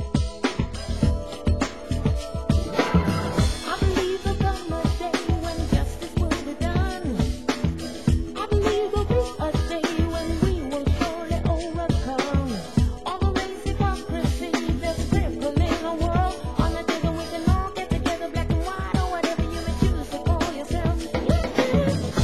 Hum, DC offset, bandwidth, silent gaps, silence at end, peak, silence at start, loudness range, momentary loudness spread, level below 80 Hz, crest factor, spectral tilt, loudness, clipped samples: none; 0.8%; 12.5 kHz; none; 0 s; -4 dBFS; 0 s; 1 LU; 4 LU; -28 dBFS; 20 dB; -6 dB/octave; -25 LUFS; under 0.1%